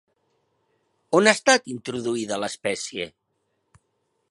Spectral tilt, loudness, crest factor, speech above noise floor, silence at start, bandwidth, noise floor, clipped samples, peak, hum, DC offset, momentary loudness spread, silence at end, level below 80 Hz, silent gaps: -3 dB/octave; -22 LUFS; 26 dB; 51 dB; 1.1 s; 11.5 kHz; -74 dBFS; under 0.1%; 0 dBFS; none; under 0.1%; 14 LU; 1.2 s; -68 dBFS; none